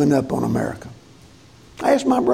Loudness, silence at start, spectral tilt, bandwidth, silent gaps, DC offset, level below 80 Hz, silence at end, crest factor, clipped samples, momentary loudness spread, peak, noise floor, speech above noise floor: -20 LUFS; 0 s; -6.5 dB/octave; 15 kHz; none; under 0.1%; -50 dBFS; 0 s; 16 dB; under 0.1%; 17 LU; -4 dBFS; -47 dBFS; 29 dB